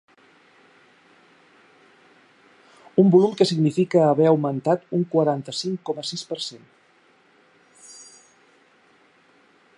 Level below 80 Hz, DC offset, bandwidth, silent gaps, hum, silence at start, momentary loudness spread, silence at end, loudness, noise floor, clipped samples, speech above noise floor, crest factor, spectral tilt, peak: -76 dBFS; under 0.1%; 11.5 kHz; none; none; 2.95 s; 16 LU; 1.85 s; -21 LUFS; -58 dBFS; under 0.1%; 38 dB; 20 dB; -6.5 dB/octave; -4 dBFS